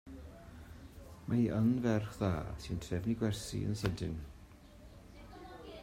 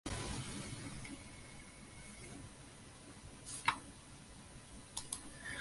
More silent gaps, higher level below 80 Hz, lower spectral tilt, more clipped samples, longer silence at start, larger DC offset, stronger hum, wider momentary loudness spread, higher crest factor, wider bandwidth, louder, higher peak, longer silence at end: neither; about the same, -54 dBFS vs -58 dBFS; first, -7 dB/octave vs -3 dB/octave; neither; about the same, 0.05 s vs 0.05 s; neither; neither; first, 24 LU vs 17 LU; second, 18 dB vs 30 dB; first, 16 kHz vs 11.5 kHz; first, -36 LUFS vs -46 LUFS; second, -20 dBFS vs -16 dBFS; about the same, 0 s vs 0 s